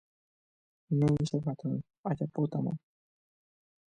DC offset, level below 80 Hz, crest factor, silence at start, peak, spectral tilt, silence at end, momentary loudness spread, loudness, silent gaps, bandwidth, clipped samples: under 0.1%; -62 dBFS; 18 dB; 0.9 s; -16 dBFS; -8.5 dB/octave; 1.15 s; 9 LU; -32 LUFS; 1.98-2.04 s; 9.6 kHz; under 0.1%